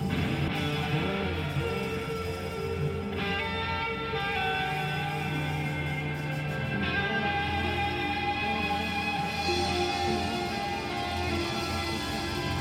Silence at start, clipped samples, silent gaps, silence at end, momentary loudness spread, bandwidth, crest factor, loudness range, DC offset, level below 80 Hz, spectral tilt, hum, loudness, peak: 0 s; under 0.1%; none; 0 s; 4 LU; 16.5 kHz; 14 dB; 2 LU; under 0.1%; -46 dBFS; -5 dB/octave; none; -30 LUFS; -16 dBFS